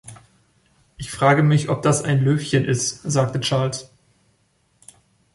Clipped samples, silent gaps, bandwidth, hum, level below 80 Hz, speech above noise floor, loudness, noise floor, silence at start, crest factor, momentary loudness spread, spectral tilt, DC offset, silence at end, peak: under 0.1%; none; 11.5 kHz; none; -54 dBFS; 45 dB; -19 LUFS; -64 dBFS; 0.05 s; 18 dB; 10 LU; -5 dB/octave; under 0.1%; 1.5 s; -2 dBFS